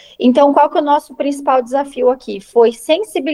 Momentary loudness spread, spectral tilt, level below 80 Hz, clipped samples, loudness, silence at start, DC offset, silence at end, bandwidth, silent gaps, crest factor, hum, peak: 8 LU; -4 dB/octave; -58 dBFS; under 0.1%; -14 LUFS; 0.2 s; under 0.1%; 0 s; 12.5 kHz; none; 14 dB; none; 0 dBFS